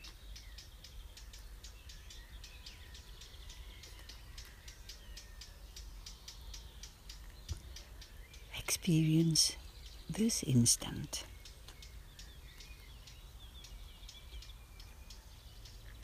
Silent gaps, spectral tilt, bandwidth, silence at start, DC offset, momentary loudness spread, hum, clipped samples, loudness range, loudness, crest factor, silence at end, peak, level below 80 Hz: none; -4 dB/octave; 15.5 kHz; 0 s; under 0.1%; 24 LU; none; under 0.1%; 21 LU; -33 LUFS; 24 dB; 0 s; -16 dBFS; -52 dBFS